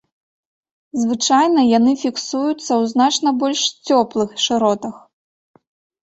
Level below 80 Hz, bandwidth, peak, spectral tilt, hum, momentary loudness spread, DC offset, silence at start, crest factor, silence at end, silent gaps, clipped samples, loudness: -62 dBFS; 8.2 kHz; -2 dBFS; -3 dB/octave; none; 8 LU; under 0.1%; 0.95 s; 16 dB; 1.05 s; none; under 0.1%; -17 LUFS